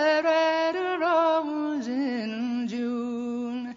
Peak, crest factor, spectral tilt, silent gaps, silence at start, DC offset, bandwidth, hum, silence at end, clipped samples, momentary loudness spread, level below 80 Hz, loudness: -12 dBFS; 12 dB; -4.5 dB/octave; none; 0 s; under 0.1%; 7.6 kHz; 50 Hz at -65 dBFS; 0 s; under 0.1%; 9 LU; -72 dBFS; -26 LUFS